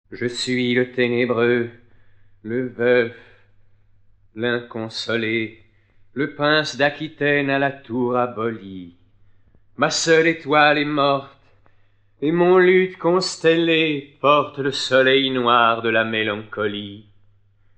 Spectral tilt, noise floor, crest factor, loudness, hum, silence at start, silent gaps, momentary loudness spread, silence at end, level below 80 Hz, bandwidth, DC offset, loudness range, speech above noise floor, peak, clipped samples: -4.5 dB/octave; -55 dBFS; 18 dB; -19 LUFS; none; 0.1 s; none; 11 LU; 0.75 s; -62 dBFS; 9.4 kHz; under 0.1%; 7 LU; 36 dB; -2 dBFS; under 0.1%